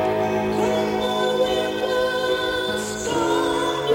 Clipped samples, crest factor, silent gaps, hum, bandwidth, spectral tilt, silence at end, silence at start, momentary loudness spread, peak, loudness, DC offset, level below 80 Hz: under 0.1%; 14 dB; none; none; 17 kHz; -4 dB/octave; 0 s; 0 s; 3 LU; -8 dBFS; -22 LUFS; under 0.1%; -48 dBFS